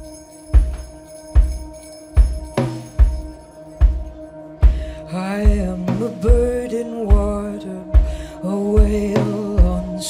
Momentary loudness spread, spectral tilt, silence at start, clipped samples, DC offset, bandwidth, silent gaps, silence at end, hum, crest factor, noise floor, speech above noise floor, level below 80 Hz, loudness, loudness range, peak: 19 LU; -7.5 dB/octave; 0 s; under 0.1%; under 0.1%; 11.5 kHz; none; 0 s; none; 16 dB; -38 dBFS; 22 dB; -18 dBFS; -20 LUFS; 3 LU; -2 dBFS